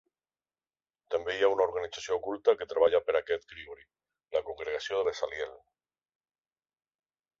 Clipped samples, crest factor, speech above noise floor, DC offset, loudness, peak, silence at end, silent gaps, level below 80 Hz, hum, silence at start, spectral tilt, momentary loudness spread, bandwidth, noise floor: under 0.1%; 22 dB; over 60 dB; under 0.1%; -30 LUFS; -12 dBFS; 1.85 s; none; -66 dBFS; none; 1.1 s; -3 dB/octave; 12 LU; 7.6 kHz; under -90 dBFS